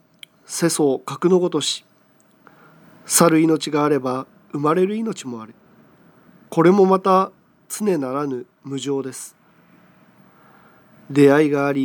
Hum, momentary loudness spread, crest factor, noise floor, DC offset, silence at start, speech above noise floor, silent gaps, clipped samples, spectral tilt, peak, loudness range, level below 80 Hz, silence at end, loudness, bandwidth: none; 17 LU; 20 dB; -56 dBFS; under 0.1%; 0.5 s; 38 dB; none; under 0.1%; -5 dB/octave; 0 dBFS; 8 LU; -74 dBFS; 0 s; -19 LUFS; over 20 kHz